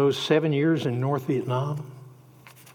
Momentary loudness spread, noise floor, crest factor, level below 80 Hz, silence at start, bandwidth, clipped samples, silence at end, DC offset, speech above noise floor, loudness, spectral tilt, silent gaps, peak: 11 LU; -50 dBFS; 16 dB; -78 dBFS; 0 s; 18 kHz; under 0.1%; 0.25 s; under 0.1%; 26 dB; -25 LUFS; -7 dB/octave; none; -10 dBFS